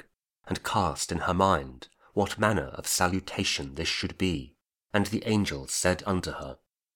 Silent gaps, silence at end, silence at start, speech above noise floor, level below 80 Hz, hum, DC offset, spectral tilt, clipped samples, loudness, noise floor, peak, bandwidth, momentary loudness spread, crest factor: none; 0.4 s; 0.45 s; 25 dB; -50 dBFS; none; under 0.1%; -4 dB/octave; under 0.1%; -28 LUFS; -54 dBFS; -8 dBFS; 19.5 kHz; 9 LU; 22 dB